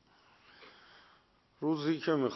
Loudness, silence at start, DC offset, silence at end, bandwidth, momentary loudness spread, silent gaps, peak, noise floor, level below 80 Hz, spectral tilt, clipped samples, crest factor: -33 LUFS; 0.6 s; under 0.1%; 0 s; 6.2 kHz; 25 LU; none; -18 dBFS; -67 dBFS; -80 dBFS; -7 dB/octave; under 0.1%; 18 dB